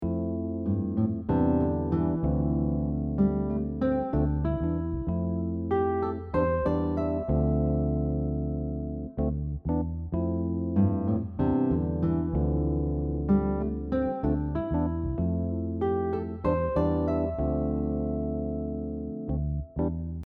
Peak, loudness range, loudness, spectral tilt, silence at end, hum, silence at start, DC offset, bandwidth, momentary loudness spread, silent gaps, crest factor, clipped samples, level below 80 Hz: -12 dBFS; 2 LU; -28 LUFS; -12 dB/octave; 0 s; none; 0 s; under 0.1%; 4.3 kHz; 5 LU; none; 14 dB; under 0.1%; -36 dBFS